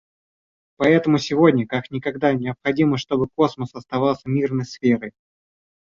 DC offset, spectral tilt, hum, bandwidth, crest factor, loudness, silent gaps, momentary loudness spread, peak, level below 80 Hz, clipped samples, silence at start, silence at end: under 0.1%; -7 dB/octave; none; 7.4 kHz; 18 dB; -20 LUFS; none; 9 LU; -4 dBFS; -56 dBFS; under 0.1%; 0.8 s; 0.85 s